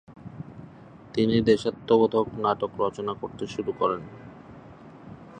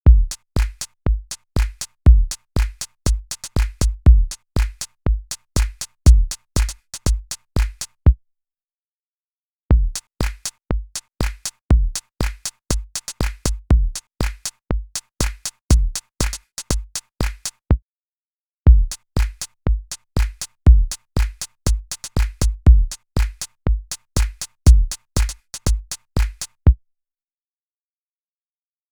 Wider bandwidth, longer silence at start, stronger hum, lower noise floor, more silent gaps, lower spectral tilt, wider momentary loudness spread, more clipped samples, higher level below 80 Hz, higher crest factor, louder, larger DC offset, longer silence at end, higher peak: second, 9.4 kHz vs 19 kHz; about the same, 0.1 s vs 0.05 s; neither; second, -47 dBFS vs under -90 dBFS; second, none vs 8.73-9.69 s, 11.65-11.69 s, 15.61-15.69 s, 17.82-18.63 s; first, -7 dB/octave vs -5 dB/octave; first, 25 LU vs 12 LU; neither; second, -56 dBFS vs -20 dBFS; about the same, 20 dB vs 18 dB; second, -25 LUFS vs -22 LUFS; neither; second, 0 s vs 2.15 s; second, -8 dBFS vs 0 dBFS